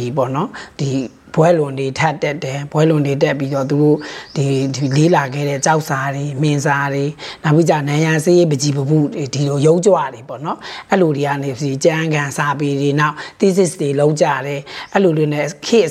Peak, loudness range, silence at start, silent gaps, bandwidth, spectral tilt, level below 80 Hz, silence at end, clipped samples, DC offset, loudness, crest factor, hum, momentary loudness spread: 0 dBFS; 2 LU; 0 s; none; 13.5 kHz; -6 dB/octave; -56 dBFS; 0 s; under 0.1%; under 0.1%; -16 LUFS; 14 dB; none; 9 LU